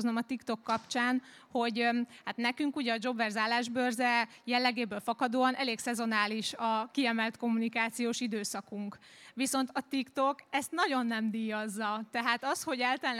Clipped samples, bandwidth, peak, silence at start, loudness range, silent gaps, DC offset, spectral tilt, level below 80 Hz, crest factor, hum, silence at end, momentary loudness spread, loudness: under 0.1%; 15.5 kHz; -12 dBFS; 0 s; 3 LU; none; under 0.1%; -3 dB/octave; -84 dBFS; 20 dB; none; 0 s; 6 LU; -32 LUFS